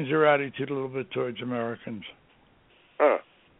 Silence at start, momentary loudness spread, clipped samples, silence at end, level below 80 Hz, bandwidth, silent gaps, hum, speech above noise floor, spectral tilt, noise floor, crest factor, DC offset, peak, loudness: 0 s; 16 LU; under 0.1%; 0.4 s; -70 dBFS; 3.9 kHz; none; none; 33 dB; -2 dB/octave; -60 dBFS; 20 dB; under 0.1%; -8 dBFS; -27 LUFS